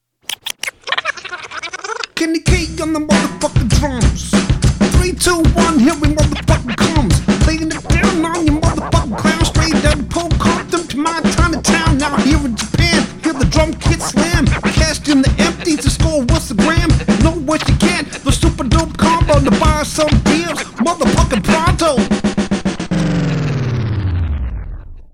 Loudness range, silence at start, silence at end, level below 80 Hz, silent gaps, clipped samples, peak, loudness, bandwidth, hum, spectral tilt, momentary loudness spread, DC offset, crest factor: 3 LU; 0.3 s; 0.1 s; -22 dBFS; none; under 0.1%; 0 dBFS; -15 LUFS; 16.5 kHz; none; -5 dB/octave; 7 LU; under 0.1%; 14 dB